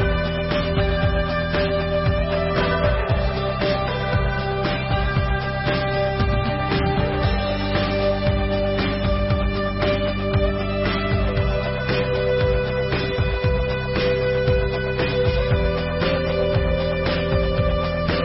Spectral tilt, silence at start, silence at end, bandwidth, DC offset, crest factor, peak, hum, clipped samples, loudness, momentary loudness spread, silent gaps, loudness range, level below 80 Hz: -10.5 dB/octave; 0 s; 0 s; 5.8 kHz; under 0.1%; 14 dB; -8 dBFS; none; under 0.1%; -21 LUFS; 2 LU; none; 1 LU; -28 dBFS